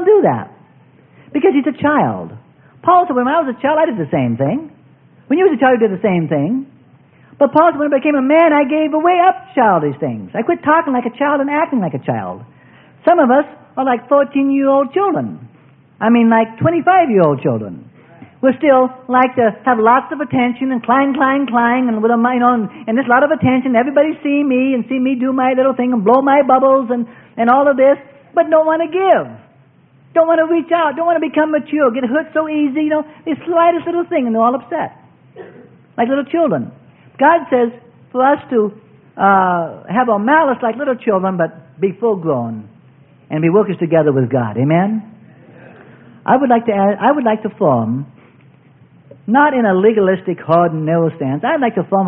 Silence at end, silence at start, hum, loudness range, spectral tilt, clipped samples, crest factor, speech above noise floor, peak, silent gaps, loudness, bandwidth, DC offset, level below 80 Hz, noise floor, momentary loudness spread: 0 s; 0 s; none; 4 LU; -12 dB/octave; under 0.1%; 14 dB; 35 dB; 0 dBFS; none; -14 LUFS; 3.8 kHz; under 0.1%; -60 dBFS; -49 dBFS; 9 LU